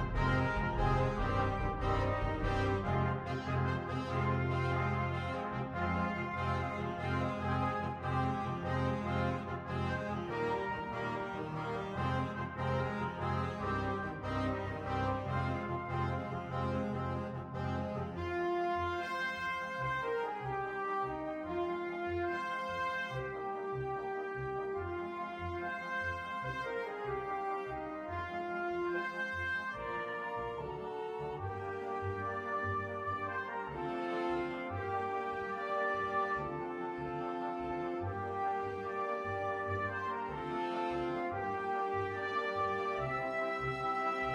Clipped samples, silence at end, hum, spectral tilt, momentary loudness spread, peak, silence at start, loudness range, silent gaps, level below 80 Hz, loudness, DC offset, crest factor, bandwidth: under 0.1%; 0 s; none; -7.5 dB/octave; 6 LU; -20 dBFS; 0 s; 4 LU; none; -50 dBFS; -37 LUFS; under 0.1%; 16 dB; 9.6 kHz